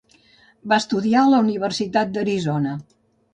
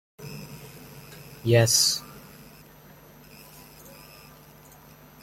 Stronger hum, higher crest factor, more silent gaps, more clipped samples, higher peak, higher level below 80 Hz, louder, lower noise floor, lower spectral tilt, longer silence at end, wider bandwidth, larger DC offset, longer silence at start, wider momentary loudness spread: neither; second, 16 dB vs 24 dB; neither; neither; about the same, -4 dBFS vs -6 dBFS; about the same, -62 dBFS vs -60 dBFS; about the same, -20 LUFS vs -21 LUFS; first, -55 dBFS vs -50 dBFS; first, -5.5 dB/octave vs -3 dB/octave; second, 0.5 s vs 3.05 s; second, 9.8 kHz vs 16.5 kHz; neither; first, 0.65 s vs 0.2 s; second, 10 LU vs 28 LU